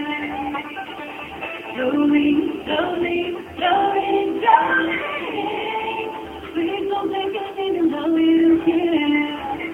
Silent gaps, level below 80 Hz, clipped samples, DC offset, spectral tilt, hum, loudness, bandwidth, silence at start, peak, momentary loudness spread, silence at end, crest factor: none; -54 dBFS; under 0.1%; under 0.1%; -6 dB/octave; none; -20 LUFS; 4 kHz; 0 s; -2 dBFS; 13 LU; 0 s; 18 dB